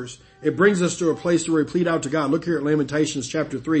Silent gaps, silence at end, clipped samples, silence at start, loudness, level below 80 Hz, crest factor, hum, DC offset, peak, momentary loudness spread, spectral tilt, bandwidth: none; 0 s; under 0.1%; 0 s; -22 LUFS; -56 dBFS; 18 dB; none; under 0.1%; -4 dBFS; 8 LU; -5.5 dB/octave; 8.8 kHz